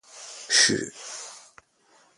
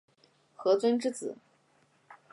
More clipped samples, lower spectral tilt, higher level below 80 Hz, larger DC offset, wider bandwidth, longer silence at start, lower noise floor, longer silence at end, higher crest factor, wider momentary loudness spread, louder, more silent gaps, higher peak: neither; second, -0.5 dB/octave vs -4.5 dB/octave; first, -66 dBFS vs -86 dBFS; neither; about the same, 11.5 kHz vs 11.5 kHz; second, 0.15 s vs 0.6 s; second, -61 dBFS vs -68 dBFS; first, 0.8 s vs 0.2 s; first, 24 dB vs 18 dB; first, 22 LU vs 15 LU; first, -20 LUFS vs -30 LUFS; neither; first, -6 dBFS vs -14 dBFS